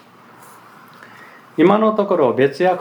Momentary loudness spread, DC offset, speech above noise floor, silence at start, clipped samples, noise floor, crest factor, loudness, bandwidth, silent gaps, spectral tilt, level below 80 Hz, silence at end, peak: 3 LU; under 0.1%; 30 dB; 1.6 s; under 0.1%; -44 dBFS; 18 dB; -15 LUFS; over 20 kHz; none; -7.5 dB/octave; -76 dBFS; 0 s; 0 dBFS